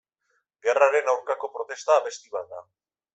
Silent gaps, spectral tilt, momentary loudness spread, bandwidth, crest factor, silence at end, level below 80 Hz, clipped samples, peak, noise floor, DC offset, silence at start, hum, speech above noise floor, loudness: none; -0.5 dB/octave; 15 LU; 8.2 kHz; 22 dB; 0.55 s; -80 dBFS; under 0.1%; -4 dBFS; -74 dBFS; under 0.1%; 0.65 s; none; 49 dB; -25 LUFS